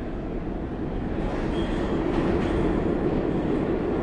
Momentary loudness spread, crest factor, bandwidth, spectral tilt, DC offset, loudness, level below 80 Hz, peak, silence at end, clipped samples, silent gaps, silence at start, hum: 7 LU; 12 dB; 9.4 kHz; -8.5 dB/octave; under 0.1%; -26 LUFS; -34 dBFS; -12 dBFS; 0 s; under 0.1%; none; 0 s; none